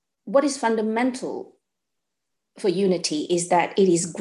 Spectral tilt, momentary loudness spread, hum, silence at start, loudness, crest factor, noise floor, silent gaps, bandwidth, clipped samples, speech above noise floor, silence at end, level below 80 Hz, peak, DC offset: -4.5 dB/octave; 8 LU; none; 0.25 s; -22 LUFS; 18 dB; -83 dBFS; none; 12 kHz; under 0.1%; 61 dB; 0 s; -72 dBFS; -6 dBFS; under 0.1%